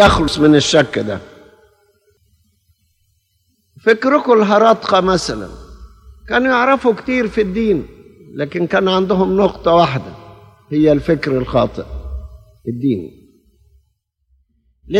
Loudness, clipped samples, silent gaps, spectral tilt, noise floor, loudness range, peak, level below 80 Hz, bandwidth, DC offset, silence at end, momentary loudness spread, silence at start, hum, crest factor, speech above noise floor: -15 LUFS; under 0.1%; none; -5.5 dB/octave; -65 dBFS; 8 LU; 0 dBFS; -36 dBFS; 11.5 kHz; under 0.1%; 0 s; 17 LU; 0 s; none; 16 dB; 51 dB